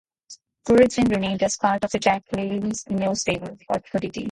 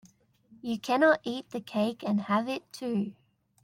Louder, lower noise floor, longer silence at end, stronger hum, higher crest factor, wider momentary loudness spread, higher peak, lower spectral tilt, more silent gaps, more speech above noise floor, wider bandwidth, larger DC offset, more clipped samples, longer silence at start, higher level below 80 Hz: first, -22 LUFS vs -29 LUFS; second, -49 dBFS vs -61 dBFS; second, 0 s vs 0.5 s; neither; about the same, 18 dB vs 20 dB; about the same, 11 LU vs 12 LU; first, -4 dBFS vs -10 dBFS; second, -4.5 dB/octave vs -6 dB/octave; neither; second, 27 dB vs 32 dB; second, 11.5 kHz vs 16 kHz; neither; neither; second, 0.3 s vs 0.65 s; first, -50 dBFS vs -76 dBFS